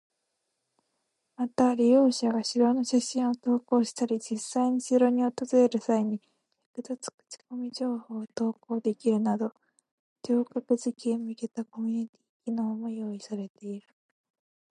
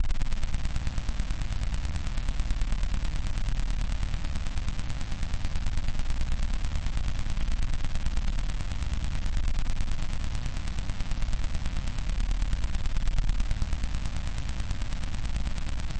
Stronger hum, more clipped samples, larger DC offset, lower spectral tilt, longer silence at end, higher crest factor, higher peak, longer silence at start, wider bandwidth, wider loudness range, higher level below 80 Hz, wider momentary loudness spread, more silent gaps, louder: neither; neither; second, under 0.1% vs 0.4%; about the same, -5 dB/octave vs -5 dB/octave; first, 0.9 s vs 0 s; first, 18 dB vs 12 dB; first, -10 dBFS vs -14 dBFS; first, 1.4 s vs 0 s; first, 11.5 kHz vs 9.2 kHz; first, 8 LU vs 1 LU; second, -80 dBFS vs -28 dBFS; first, 15 LU vs 3 LU; first, 6.66-6.74 s, 7.14-7.18 s, 9.91-10.16 s, 12.09-12.13 s, 12.29-12.40 s, 13.50-13.55 s vs none; first, -28 LUFS vs -34 LUFS